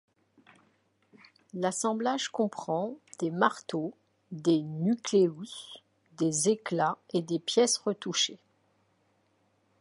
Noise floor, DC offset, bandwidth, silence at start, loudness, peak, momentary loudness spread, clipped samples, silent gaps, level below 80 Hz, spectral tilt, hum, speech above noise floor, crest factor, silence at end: -71 dBFS; under 0.1%; 11.5 kHz; 1.55 s; -29 LUFS; -10 dBFS; 14 LU; under 0.1%; none; -82 dBFS; -4 dB/octave; none; 42 dB; 22 dB; 1.45 s